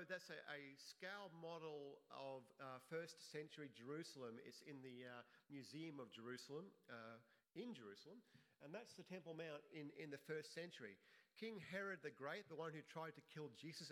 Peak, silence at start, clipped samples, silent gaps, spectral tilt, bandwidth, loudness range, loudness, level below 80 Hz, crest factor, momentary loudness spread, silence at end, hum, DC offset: -36 dBFS; 0 s; under 0.1%; none; -4.5 dB/octave; 15.5 kHz; 4 LU; -56 LUFS; under -90 dBFS; 20 dB; 8 LU; 0 s; none; under 0.1%